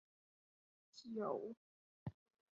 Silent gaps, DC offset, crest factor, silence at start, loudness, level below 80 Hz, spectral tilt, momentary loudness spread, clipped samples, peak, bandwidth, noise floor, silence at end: 1.57-2.06 s; under 0.1%; 22 dB; 0.95 s; -48 LUFS; -78 dBFS; -7 dB/octave; 17 LU; under 0.1%; -30 dBFS; 7.2 kHz; under -90 dBFS; 0.4 s